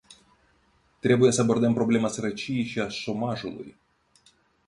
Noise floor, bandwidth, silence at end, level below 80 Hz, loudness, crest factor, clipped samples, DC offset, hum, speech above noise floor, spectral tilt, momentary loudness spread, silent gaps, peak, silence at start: -65 dBFS; 11 kHz; 1 s; -62 dBFS; -25 LUFS; 20 dB; under 0.1%; under 0.1%; none; 40 dB; -5.5 dB/octave; 14 LU; none; -8 dBFS; 0.1 s